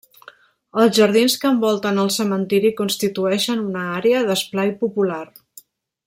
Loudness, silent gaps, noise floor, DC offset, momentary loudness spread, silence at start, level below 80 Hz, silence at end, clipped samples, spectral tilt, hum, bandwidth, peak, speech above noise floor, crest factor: -19 LUFS; none; -48 dBFS; under 0.1%; 8 LU; 0.75 s; -64 dBFS; 0.8 s; under 0.1%; -4.5 dB/octave; none; 16.5 kHz; -4 dBFS; 30 dB; 16 dB